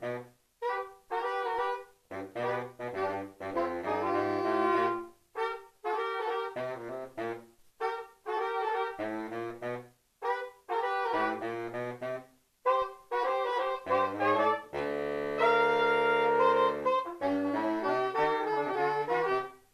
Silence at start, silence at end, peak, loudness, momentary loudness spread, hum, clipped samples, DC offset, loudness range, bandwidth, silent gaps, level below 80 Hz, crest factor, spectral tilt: 0 s; 0.15 s; -14 dBFS; -32 LUFS; 13 LU; none; under 0.1%; under 0.1%; 8 LU; 14 kHz; none; -68 dBFS; 18 dB; -5.5 dB/octave